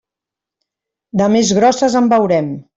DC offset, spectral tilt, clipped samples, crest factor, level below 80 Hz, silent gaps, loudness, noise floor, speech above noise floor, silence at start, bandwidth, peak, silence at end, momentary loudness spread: under 0.1%; -5 dB/octave; under 0.1%; 14 dB; -54 dBFS; none; -13 LUFS; -85 dBFS; 72 dB; 1.15 s; 8 kHz; -2 dBFS; 0.15 s; 5 LU